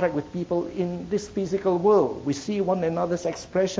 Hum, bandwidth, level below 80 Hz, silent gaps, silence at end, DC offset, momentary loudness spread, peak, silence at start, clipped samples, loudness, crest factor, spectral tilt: none; 8 kHz; -54 dBFS; none; 0 s; under 0.1%; 9 LU; -8 dBFS; 0 s; under 0.1%; -25 LUFS; 16 dB; -6.5 dB/octave